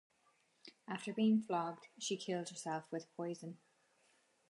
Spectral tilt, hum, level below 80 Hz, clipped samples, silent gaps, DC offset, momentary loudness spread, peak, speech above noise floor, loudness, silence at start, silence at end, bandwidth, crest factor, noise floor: -5 dB/octave; none; under -90 dBFS; under 0.1%; none; under 0.1%; 22 LU; -24 dBFS; 36 dB; -40 LUFS; 0.65 s; 0.95 s; 11.5 kHz; 18 dB; -76 dBFS